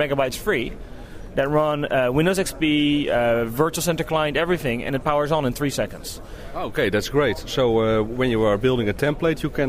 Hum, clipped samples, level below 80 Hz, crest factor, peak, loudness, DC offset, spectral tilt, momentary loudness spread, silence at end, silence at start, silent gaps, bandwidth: none; under 0.1%; -40 dBFS; 16 dB; -6 dBFS; -22 LUFS; under 0.1%; -5 dB/octave; 10 LU; 0 s; 0 s; none; 16 kHz